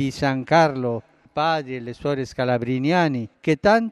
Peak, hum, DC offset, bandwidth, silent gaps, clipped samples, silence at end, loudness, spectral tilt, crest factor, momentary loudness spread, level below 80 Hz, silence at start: -4 dBFS; none; under 0.1%; 12 kHz; none; under 0.1%; 0 s; -22 LUFS; -6.5 dB/octave; 16 dB; 10 LU; -54 dBFS; 0 s